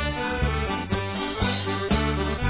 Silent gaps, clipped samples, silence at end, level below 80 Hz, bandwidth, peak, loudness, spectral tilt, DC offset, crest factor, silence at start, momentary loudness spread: none; under 0.1%; 0 s; -32 dBFS; 4 kHz; -10 dBFS; -26 LUFS; -10 dB/octave; 0.3%; 14 dB; 0 s; 3 LU